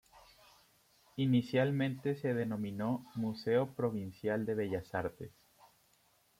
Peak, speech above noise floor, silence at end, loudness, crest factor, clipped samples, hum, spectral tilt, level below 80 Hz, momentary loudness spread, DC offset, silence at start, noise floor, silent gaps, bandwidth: -18 dBFS; 36 dB; 1.1 s; -35 LUFS; 18 dB; under 0.1%; none; -8 dB/octave; -70 dBFS; 8 LU; under 0.1%; 0.15 s; -71 dBFS; none; 16 kHz